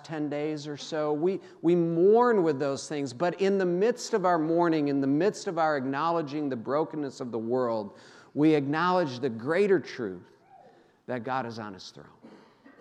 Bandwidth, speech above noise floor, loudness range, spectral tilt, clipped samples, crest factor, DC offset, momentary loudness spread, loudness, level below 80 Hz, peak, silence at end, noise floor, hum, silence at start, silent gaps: 10.5 kHz; 30 dB; 5 LU; -6.5 dB/octave; under 0.1%; 16 dB; under 0.1%; 12 LU; -27 LUFS; -84 dBFS; -10 dBFS; 0.45 s; -57 dBFS; none; 0.05 s; none